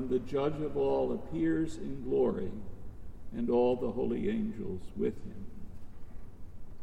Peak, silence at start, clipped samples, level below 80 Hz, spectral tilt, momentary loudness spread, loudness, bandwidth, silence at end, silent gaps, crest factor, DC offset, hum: -18 dBFS; 0 s; under 0.1%; -48 dBFS; -8 dB/octave; 23 LU; -33 LUFS; 9.6 kHz; 0 s; none; 16 dB; under 0.1%; none